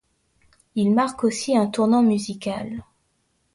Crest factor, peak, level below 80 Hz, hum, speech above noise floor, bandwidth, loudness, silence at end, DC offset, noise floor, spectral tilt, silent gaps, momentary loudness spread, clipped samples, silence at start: 16 dB; -6 dBFS; -58 dBFS; none; 48 dB; 11.5 kHz; -22 LUFS; 0.75 s; under 0.1%; -69 dBFS; -5.5 dB/octave; none; 13 LU; under 0.1%; 0.75 s